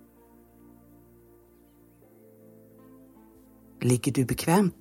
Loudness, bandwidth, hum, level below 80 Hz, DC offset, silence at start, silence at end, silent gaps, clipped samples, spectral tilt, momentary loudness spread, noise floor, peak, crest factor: -26 LUFS; 17 kHz; none; -58 dBFS; under 0.1%; 3.8 s; 0.1 s; none; under 0.1%; -6 dB/octave; 4 LU; -57 dBFS; -8 dBFS; 22 dB